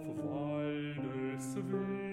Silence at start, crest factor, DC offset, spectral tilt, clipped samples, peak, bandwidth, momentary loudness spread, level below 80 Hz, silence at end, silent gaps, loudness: 0 s; 14 dB; under 0.1%; -6.5 dB/octave; under 0.1%; -24 dBFS; 15 kHz; 3 LU; -68 dBFS; 0 s; none; -38 LUFS